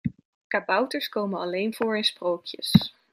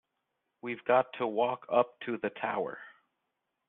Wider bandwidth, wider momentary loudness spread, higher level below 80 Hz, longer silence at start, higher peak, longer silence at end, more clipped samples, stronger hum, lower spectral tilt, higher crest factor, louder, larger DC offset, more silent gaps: first, 16 kHz vs 4 kHz; second, 8 LU vs 12 LU; first, -58 dBFS vs -80 dBFS; second, 0.05 s vs 0.65 s; first, -2 dBFS vs -10 dBFS; second, 0.25 s vs 0.8 s; neither; neither; first, -5.5 dB/octave vs -3 dB/octave; about the same, 24 dB vs 22 dB; first, -26 LUFS vs -32 LUFS; neither; first, 0.25-0.50 s vs none